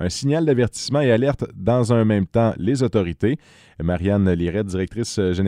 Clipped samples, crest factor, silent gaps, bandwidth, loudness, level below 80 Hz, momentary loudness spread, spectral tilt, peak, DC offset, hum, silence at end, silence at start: under 0.1%; 16 dB; none; 13 kHz; -20 LUFS; -42 dBFS; 7 LU; -6.5 dB/octave; -4 dBFS; under 0.1%; none; 0 s; 0 s